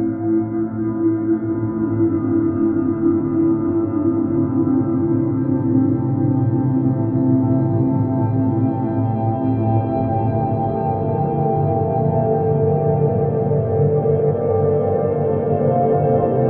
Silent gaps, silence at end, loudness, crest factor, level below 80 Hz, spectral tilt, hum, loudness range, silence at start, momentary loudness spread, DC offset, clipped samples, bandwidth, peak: none; 0 s; -18 LUFS; 12 dB; -46 dBFS; -14.5 dB/octave; none; 1 LU; 0 s; 3 LU; under 0.1%; under 0.1%; 3.3 kHz; -4 dBFS